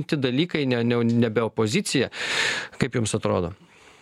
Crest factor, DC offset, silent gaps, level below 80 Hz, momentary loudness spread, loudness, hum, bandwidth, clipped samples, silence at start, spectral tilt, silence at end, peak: 18 dB; under 0.1%; none; -54 dBFS; 4 LU; -24 LUFS; none; 13.5 kHz; under 0.1%; 0 s; -5 dB/octave; 0.45 s; -6 dBFS